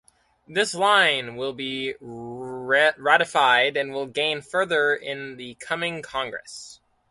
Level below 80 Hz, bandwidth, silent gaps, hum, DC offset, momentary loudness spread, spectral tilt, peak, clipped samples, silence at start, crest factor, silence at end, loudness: -66 dBFS; 11.5 kHz; none; none; under 0.1%; 18 LU; -2.5 dB/octave; -4 dBFS; under 0.1%; 0.5 s; 20 dB; 0.35 s; -22 LUFS